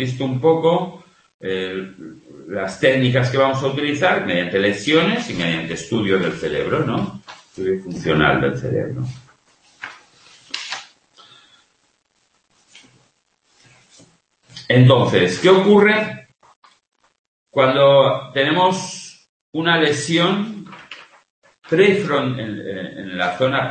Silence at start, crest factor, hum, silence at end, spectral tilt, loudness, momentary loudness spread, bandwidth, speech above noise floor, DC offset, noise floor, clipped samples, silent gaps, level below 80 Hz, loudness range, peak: 0 s; 18 dB; none; 0 s; -5.5 dB/octave; -18 LUFS; 20 LU; 8.8 kHz; 48 dB; under 0.1%; -65 dBFS; under 0.1%; 1.34-1.39 s, 16.56-16.62 s, 17.19-17.46 s, 19.29-19.53 s, 21.30-21.42 s; -52 dBFS; 14 LU; 0 dBFS